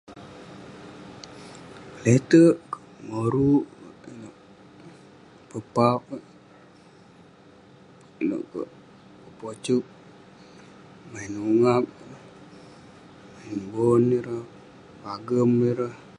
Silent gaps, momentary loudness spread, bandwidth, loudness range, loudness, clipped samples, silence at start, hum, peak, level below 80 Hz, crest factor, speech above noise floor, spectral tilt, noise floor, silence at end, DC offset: none; 24 LU; 10.5 kHz; 10 LU; -23 LUFS; under 0.1%; 0.1 s; none; -6 dBFS; -62 dBFS; 22 dB; 30 dB; -7.5 dB/octave; -52 dBFS; 0.2 s; under 0.1%